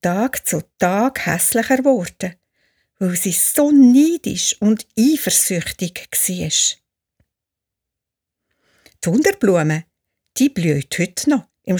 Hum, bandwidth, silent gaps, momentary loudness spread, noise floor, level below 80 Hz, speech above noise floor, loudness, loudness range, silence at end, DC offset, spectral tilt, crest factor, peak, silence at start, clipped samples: none; over 20 kHz; none; 11 LU; -84 dBFS; -54 dBFS; 67 dB; -17 LUFS; 7 LU; 0 s; under 0.1%; -4 dB/octave; 16 dB; -2 dBFS; 0.05 s; under 0.1%